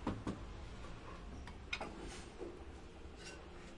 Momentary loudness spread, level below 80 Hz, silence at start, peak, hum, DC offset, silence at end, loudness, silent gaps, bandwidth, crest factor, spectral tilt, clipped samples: 9 LU; -54 dBFS; 0 s; -26 dBFS; none; under 0.1%; 0 s; -49 LUFS; none; 11.5 kHz; 22 dB; -5 dB/octave; under 0.1%